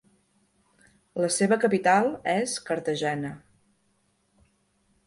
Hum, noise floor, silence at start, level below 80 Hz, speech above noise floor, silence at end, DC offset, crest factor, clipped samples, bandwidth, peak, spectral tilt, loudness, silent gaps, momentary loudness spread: none; -70 dBFS; 1.15 s; -68 dBFS; 45 dB; 1.7 s; under 0.1%; 18 dB; under 0.1%; 11.5 kHz; -10 dBFS; -4 dB/octave; -25 LUFS; none; 14 LU